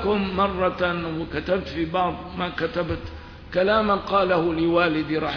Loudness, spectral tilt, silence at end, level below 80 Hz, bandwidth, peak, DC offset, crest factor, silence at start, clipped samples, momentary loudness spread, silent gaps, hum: -23 LUFS; -7.5 dB/octave; 0 s; -42 dBFS; 5.4 kHz; -8 dBFS; under 0.1%; 16 dB; 0 s; under 0.1%; 9 LU; none; none